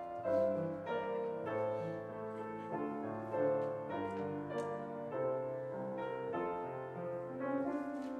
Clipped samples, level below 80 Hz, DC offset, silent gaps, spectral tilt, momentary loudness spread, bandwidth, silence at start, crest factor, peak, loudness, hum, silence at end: under 0.1%; -76 dBFS; under 0.1%; none; -8 dB/octave; 8 LU; 9.6 kHz; 0 s; 16 dB; -22 dBFS; -40 LUFS; none; 0 s